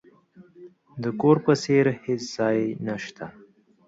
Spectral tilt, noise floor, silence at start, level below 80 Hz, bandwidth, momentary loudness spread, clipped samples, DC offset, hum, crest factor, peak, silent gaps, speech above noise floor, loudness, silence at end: -6.5 dB/octave; -53 dBFS; 0.4 s; -66 dBFS; 8 kHz; 18 LU; under 0.1%; under 0.1%; none; 20 dB; -6 dBFS; none; 30 dB; -24 LUFS; 0.55 s